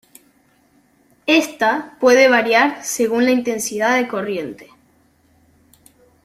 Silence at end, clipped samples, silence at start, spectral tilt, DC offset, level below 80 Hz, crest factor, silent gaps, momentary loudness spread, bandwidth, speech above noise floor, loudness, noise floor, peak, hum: 1.6 s; under 0.1%; 1.25 s; -2.5 dB/octave; under 0.1%; -64 dBFS; 18 dB; none; 12 LU; 15.5 kHz; 40 dB; -16 LUFS; -57 dBFS; -2 dBFS; none